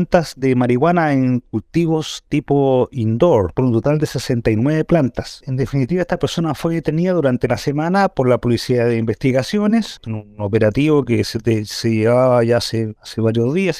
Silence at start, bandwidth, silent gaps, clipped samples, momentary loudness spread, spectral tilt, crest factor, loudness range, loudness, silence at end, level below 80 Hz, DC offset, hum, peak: 0 s; 15 kHz; none; under 0.1%; 7 LU; -7 dB/octave; 16 dB; 2 LU; -17 LUFS; 0 s; -42 dBFS; under 0.1%; none; 0 dBFS